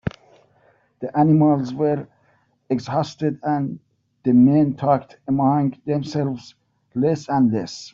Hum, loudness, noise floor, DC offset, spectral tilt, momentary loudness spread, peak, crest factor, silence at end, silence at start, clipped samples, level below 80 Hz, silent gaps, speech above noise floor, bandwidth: none; -20 LUFS; -62 dBFS; under 0.1%; -8 dB/octave; 12 LU; -4 dBFS; 16 dB; 0.05 s; 0.05 s; under 0.1%; -56 dBFS; none; 43 dB; 7.6 kHz